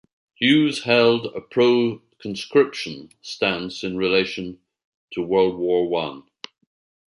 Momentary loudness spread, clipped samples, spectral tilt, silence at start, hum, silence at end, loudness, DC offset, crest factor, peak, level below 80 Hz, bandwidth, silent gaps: 18 LU; under 0.1%; -5 dB/octave; 0.4 s; none; 0.9 s; -21 LUFS; under 0.1%; 18 dB; -4 dBFS; -60 dBFS; 11.5 kHz; 4.84-5.08 s